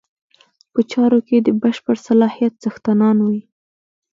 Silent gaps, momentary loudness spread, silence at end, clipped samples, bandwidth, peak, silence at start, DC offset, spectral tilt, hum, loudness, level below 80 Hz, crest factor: none; 7 LU; 0.75 s; under 0.1%; 7.4 kHz; -2 dBFS; 0.75 s; under 0.1%; -7.5 dB/octave; none; -17 LUFS; -64 dBFS; 14 dB